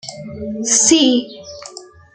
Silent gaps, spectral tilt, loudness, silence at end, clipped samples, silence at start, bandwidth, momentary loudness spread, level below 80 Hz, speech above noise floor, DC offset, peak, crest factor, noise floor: none; -1.5 dB/octave; -13 LUFS; 0.3 s; under 0.1%; 0.05 s; 10 kHz; 22 LU; -54 dBFS; 23 dB; under 0.1%; 0 dBFS; 18 dB; -38 dBFS